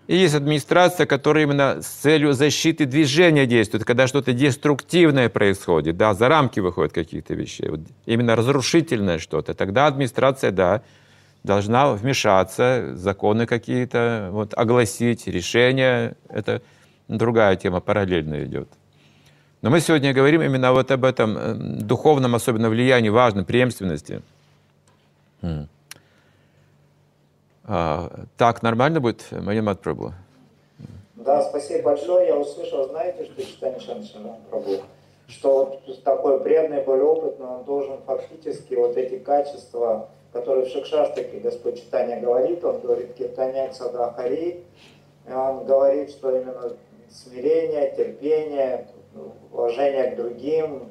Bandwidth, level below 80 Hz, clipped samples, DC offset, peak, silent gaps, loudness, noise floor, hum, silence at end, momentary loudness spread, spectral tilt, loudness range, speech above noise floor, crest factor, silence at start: 14.5 kHz; -56 dBFS; under 0.1%; under 0.1%; -2 dBFS; none; -21 LUFS; -60 dBFS; none; 0.05 s; 13 LU; -5.5 dB/octave; 8 LU; 40 dB; 20 dB; 0.1 s